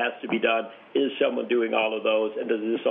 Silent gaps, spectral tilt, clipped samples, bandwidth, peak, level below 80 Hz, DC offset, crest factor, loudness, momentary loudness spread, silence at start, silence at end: none; -2 dB/octave; under 0.1%; 3.9 kHz; -10 dBFS; -86 dBFS; under 0.1%; 16 dB; -25 LUFS; 4 LU; 0 s; 0 s